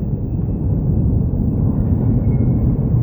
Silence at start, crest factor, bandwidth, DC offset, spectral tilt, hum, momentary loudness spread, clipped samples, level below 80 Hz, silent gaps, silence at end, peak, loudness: 0 s; 12 dB; over 20 kHz; 0.2%; -15.5 dB/octave; none; 4 LU; under 0.1%; -22 dBFS; none; 0 s; -4 dBFS; -18 LUFS